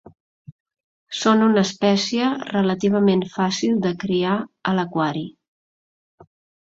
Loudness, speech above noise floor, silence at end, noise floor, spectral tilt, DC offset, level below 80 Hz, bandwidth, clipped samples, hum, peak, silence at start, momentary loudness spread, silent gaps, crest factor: -20 LUFS; over 70 dB; 0.4 s; under -90 dBFS; -5.5 dB/octave; under 0.1%; -62 dBFS; 7.8 kHz; under 0.1%; none; -4 dBFS; 0.5 s; 7 LU; 0.52-0.66 s, 0.80-1.07 s, 5.48-6.18 s; 18 dB